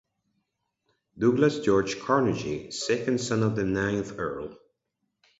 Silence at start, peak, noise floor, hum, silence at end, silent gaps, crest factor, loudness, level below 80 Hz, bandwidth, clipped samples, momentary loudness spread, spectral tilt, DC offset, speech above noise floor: 1.15 s; -8 dBFS; -80 dBFS; none; 0.85 s; none; 20 dB; -26 LUFS; -56 dBFS; 8 kHz; under 0.1%; 10 LU; -5.5 dB/octave; under 0.1%; 54 dB